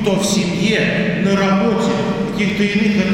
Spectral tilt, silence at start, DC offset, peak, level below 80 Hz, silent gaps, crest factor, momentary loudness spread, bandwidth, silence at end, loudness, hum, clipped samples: -5 dB/octave; 0 s; under 0.1%; -4 dBFS; -42 dBFS; none; 12 dB; 4 LU; 15 kHz; 0 s; -16 LUFS; none; under 0.1%